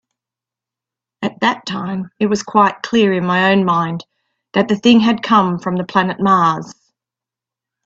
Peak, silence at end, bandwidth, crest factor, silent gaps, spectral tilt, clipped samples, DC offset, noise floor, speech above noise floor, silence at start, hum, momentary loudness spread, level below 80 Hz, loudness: 0 dBFS; 1.15 s; 7.8 kHz; 16 dB; none; -6 dB/octave; under 0.1%; under 0.1%; -87 dBFS; 72 dB; 1.2 s; none; 11 LU; -58 dBFS; -15 LUFS